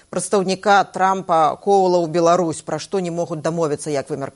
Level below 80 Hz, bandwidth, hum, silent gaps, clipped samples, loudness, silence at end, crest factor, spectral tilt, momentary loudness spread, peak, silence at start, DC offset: -64 dBFS; 11.5 kHz; none; none; under 0.1%; -19 LUFS; 0.05 s; 16 dB; -5 dB/octave; 8 LU; -2 dBFS; 0.1 s; under 0.1%